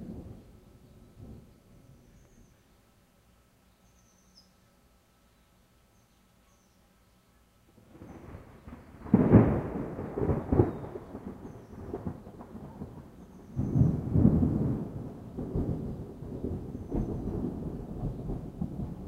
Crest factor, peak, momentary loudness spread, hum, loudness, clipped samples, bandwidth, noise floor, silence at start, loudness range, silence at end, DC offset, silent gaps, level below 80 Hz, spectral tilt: 26 dB; -6 dBFS; 25 LU; none; -30 LUFS; under 0.1%; 8.4 kHz; -64 dBFS; 0 s; 8 LU; 0 s; under 0.1%; none; -46 dBFS; -10.5 dB/octave